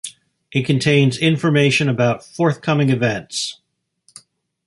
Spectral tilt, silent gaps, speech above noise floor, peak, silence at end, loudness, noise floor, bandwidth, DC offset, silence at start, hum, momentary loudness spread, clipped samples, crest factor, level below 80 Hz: -5.5 dB/octave; none; 43 dB; -2 dBFS; 1.15 s; -17 LUFS; -60 dBFS; 11.5 kHz; under 0.1%; 0.05 s; none; 9 LU; under 0.1%; 16 dB; -56 dBFS